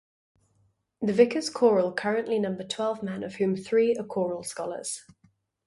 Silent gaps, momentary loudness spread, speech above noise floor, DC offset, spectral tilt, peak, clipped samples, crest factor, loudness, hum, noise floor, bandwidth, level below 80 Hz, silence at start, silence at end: none; 11 LU; 43 dB; under 0.1%; -5 dB/octave; -6 dBFS; under 0.1%; 22 dB; -27 LUFS; none; -69 dBFS; 11.5 kHz; -70 dBFS; 1 s; 0.65 s